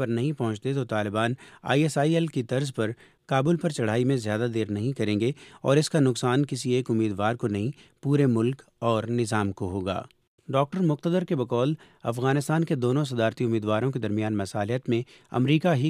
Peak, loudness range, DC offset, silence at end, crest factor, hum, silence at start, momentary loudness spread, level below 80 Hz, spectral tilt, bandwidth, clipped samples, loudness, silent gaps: -8 dBFS; 2 LU; under 0.1%; 0 s; 18 dB; none; 0 s; 7 LU; -66 dBFS; -6.5 dB/octave; 14.5 kHz; under 0.1%; -26 LUFS; 10.27-10.38 s